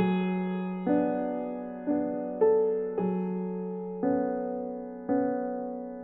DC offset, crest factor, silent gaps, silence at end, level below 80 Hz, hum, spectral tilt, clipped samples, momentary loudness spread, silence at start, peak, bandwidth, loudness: under 0.1%; 16 dB; none; 0 s; -66 dBFS; none; -8 dB/octave; under 0.1%; 9 LU; 0 s; -14 dBFS; 4 kHz; -30 LUFS